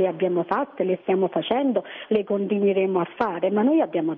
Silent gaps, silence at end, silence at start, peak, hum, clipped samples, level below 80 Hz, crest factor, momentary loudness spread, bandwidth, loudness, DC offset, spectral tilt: none; 0 s; 0 s; -8 dBFS; none; under 0.1%; -68 dBFS; 16 dB; 5 LU; 4.3 kHz; -23 LUFS; under 0.1%; -9.5 dB/octave